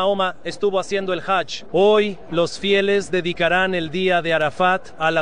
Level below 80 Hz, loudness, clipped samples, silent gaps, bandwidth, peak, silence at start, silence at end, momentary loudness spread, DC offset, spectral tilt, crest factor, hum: -52 dBFS; -20 LUFS; under 0.1%; none; 10 kHz; -4 dBFS; 0 s; 0 s; 6 LU; 2%; -4.5 dB/octave; 16 dB; none